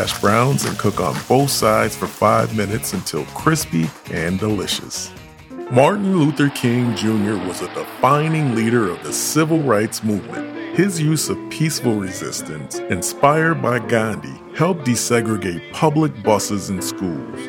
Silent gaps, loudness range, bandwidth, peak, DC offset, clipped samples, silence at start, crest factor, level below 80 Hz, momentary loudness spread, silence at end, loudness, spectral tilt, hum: none; 2 LU; 19 kHz; 0 dBFS; under 0.1%; under 0.1%; 0 s; 18 dB; -50 dBFS; 10 LU; 0 s; -19 LUFS; -5 dB/octave; none